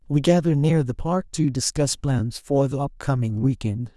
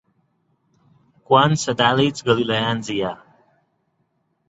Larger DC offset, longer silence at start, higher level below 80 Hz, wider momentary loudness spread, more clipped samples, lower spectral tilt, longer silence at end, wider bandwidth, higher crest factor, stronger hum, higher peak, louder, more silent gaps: neither; second, 0.1 s vs 1.3 s; first, -44 dBFS vs -58 dBFS; second, 6 LU vs 10 LU; neither; about the same, -6 dB/octave vs -5 dB/octave; second, 0.1 s vs 1.35 s; first, 12 kHz vs 8.2 kHz; about the same, 16 dB vs 20 dB; neither; about the same, -4 dBFS vs -2 dBFS; second, -22 LUFS vs -19 LUFS; neither